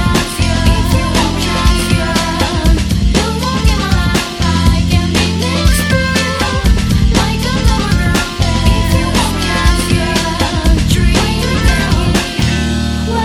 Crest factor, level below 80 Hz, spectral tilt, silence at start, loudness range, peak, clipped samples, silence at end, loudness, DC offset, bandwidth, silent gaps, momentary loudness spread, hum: 12 dB; -16 dBFS; -5 dB/octave; 0 s; 0 LU; 0 dBFS; under 0.1%; 0 s; -13 LUFS; under 0.1%; 16.5 kHz; none; 2 LU; none